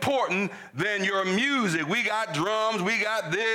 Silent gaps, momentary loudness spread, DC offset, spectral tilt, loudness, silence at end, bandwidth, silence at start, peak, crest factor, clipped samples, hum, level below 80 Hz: none; 4 LU; under 0.1%; -4 dB/octave; -25 LUFS; 0 s; 17 kHz; 0 s; -16 dBFS; 10 dB; under 0.1%; none; -72 dBFS